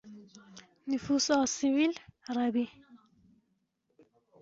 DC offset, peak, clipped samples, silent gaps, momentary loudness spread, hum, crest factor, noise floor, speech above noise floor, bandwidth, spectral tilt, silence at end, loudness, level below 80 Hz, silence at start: under 0.1%; -14 dBFS; under 0.1%; none; 25 LU; none; 20 dB; -78 dBFS; 48 dB; 8 kHz; -3 dB/octave; 1.45 s; -30 LUFS; -70 dBFS; 0.05 s